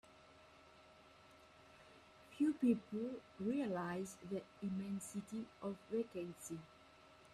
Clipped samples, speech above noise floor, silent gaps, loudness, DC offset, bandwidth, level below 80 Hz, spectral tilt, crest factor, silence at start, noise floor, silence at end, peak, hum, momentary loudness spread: under 0.1%; 22 dB; none; -43 LUFS; under 0.1%; 13.5 kHz; -78 dBFS; -6 dB/octave; 20 dB; 0.05 s; -65 dBFS; 0 s; -24 dBFS; none; 25 LU